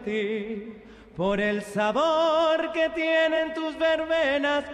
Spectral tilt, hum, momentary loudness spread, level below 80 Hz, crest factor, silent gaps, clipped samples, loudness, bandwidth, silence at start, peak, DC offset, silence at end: -5 dB/octave; none; 9 LU; -56 dBFS; 12 dB; none; under 0.1%; -24 LUFS; 11 kHz; 0 s; -12 dBFS; under 0.1%; 0 s